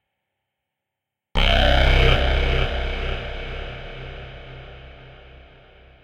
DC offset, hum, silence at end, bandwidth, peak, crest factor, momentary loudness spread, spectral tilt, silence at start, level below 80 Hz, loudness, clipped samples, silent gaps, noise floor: under 0.1%; none; 0.9 s; 7.4 kHz; -4 dBFS; 20 dB; 23 LU; -5.5 dB/octave; 1.35 s; -24 dBFS; -21 LUFS; under 0.1%; none; -84 dBFS